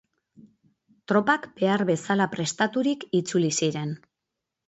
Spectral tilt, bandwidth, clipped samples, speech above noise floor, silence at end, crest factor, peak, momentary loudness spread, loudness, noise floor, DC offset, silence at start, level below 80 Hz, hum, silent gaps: -4.5 dB/octave; 8.2 kHz; under 0.1%; 60 dB; 0.7 s; 18 dB; -8 dBFS; 5 LU; -25 LUFS; -85 dBFS; under 0.1%; 1.1 s; -70 dBFS; none; none